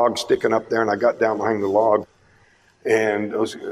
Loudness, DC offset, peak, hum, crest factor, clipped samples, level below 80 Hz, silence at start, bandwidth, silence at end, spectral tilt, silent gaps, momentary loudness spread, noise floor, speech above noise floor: -20 LUFS; under 0.1%; -4 dBFS; none; 16 dB; under 0.1%; -62 dBFS; 0 s; 14.5 kHz; 0 s; -5 dB/octave; none; 5 LU; -56 dBFS; 36 dB